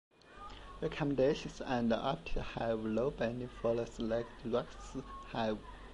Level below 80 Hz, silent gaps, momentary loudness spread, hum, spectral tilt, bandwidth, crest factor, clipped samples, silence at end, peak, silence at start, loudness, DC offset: -52 dBFS; none; 13 LU; none; -6.5 dB/octave; 11 kHz; 18 dB; under 0.1%; 0 s; -20 dBFS; 0.25 s; -37 LUFS; under 0.1%